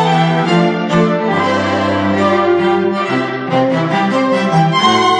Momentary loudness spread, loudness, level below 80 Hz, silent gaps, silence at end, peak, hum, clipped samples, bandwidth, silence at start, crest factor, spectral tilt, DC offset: 4 LU; -13 LUFS; -54 dBFS; none; 0 s; 0 dBFS; none; under 0.1%; 10 kHz; 0 s; 12 dB; -6 dB/octave; under 0.1%